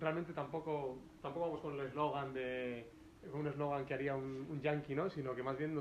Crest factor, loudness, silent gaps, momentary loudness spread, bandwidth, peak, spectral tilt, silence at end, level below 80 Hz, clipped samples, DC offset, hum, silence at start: 18 dB; -42 LUFS; none; 8 LU; 12.5 kHz; -22 dBFS; -8 dB/octave; 0 s; -68 dBFS; under 0.1%; under 0.1%; none; 0 s